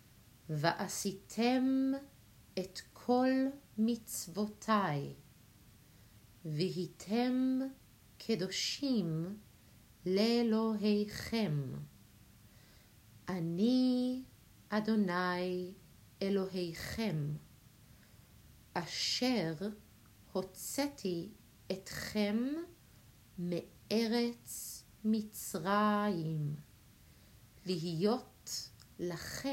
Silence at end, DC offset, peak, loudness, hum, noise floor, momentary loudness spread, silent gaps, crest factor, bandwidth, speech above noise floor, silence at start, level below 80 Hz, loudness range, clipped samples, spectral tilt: 0 s; under 0.1%; -14 dBFS; -36 LUFS; none; -61 dBFS; 13 LU; none; 22 dB; 16 kHz; 27 dB; 0.45 s; -66 dBFS; 4 LU; under 0.1%; -5 dB/octave